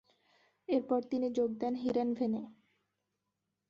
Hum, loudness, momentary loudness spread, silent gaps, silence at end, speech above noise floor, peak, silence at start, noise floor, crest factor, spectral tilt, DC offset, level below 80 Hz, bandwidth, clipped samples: 50 Hz at -70 dBFS; -34 LUFS; 8 LU; none; 1.15 s; 53 dB; -18 dBFS; 0.7 s; -86 dBFS; 18 dB; -7.5 dB/octave; under 0.1%; -76 dBFS; 7.2 kHz; under 0.1%